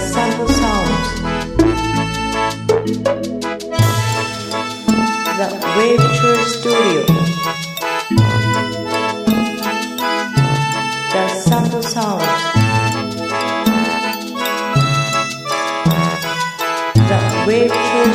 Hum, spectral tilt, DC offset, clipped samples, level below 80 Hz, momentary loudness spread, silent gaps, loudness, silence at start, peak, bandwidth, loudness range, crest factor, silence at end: none; -5 dB/octave; under 0.1%; under 0.1%; -36 dBFS; 6 LU; none; -16 LUFS; 0 s; 0 dBFS; 16 kHz; 3 LU; 16 dB; 0 s